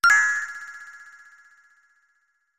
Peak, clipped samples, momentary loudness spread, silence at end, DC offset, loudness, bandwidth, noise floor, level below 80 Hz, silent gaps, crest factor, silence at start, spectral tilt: -8 dBFS; under 0.1%; 27 LU; 1.6 s; under 0.1%; -21 LUFS; 16 kHz; -70 dBFS; -66 dBFS; none; 18 dB; 0.05 s; 2.5 dB/octave